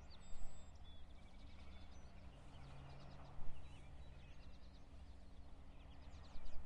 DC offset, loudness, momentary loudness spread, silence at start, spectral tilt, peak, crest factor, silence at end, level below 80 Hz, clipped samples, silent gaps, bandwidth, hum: under 0.1%; -61 LUFS; 4 LU; 0 s; -5.5 dB/octave; -30 dBFS; 16 dB; 0 s; -58 dBFS; under 0.1%; none; 8.2 kHz; none